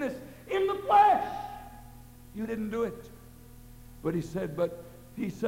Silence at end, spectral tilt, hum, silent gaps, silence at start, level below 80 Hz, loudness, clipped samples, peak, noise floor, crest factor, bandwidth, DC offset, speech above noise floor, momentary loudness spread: 0 s; -6.5 dB/octave; none; none; 0 s; -54 dBFS; -29 LUFS; under 0.1%; -12 dBFS; -50 dBFS; 20 dB; 16 kHz; under 0.1%; 18 dB; 24 LU